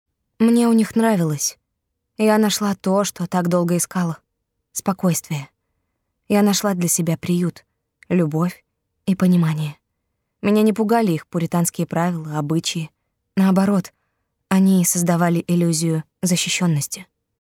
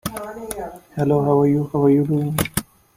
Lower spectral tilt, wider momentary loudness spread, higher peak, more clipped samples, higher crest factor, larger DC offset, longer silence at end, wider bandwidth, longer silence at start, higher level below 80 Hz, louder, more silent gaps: second, -5 dB/octave vs -6.5 dB/octave; second, 10 LU vs 14 LU; about the same, -4 dBFS vs -2 dBFS; neither; about the same, 16 dB vs 18 dB; neither; about the same, 0.4 s vs 0.35 s; about the same, 17 kHz vs 16.5 kHz; first, 0.4 s vs 0.05 s; second, -64 dBFS vs -48 dBFS; about the same, -19 LUFS vs -19 LUFS; neither